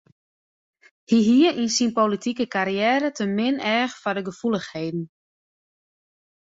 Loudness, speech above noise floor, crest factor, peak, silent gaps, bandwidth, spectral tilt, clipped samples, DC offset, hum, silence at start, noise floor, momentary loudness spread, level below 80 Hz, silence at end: -22 LUFS; over 68 dB; 18 dB; -6 dBFS; none; 8 kHz; -4.5 dB/octave; under 0.1%; under 0.1%; none; 1.1 s; under -90 dBFS; 11 LU; -66 dBFS; 1.5 s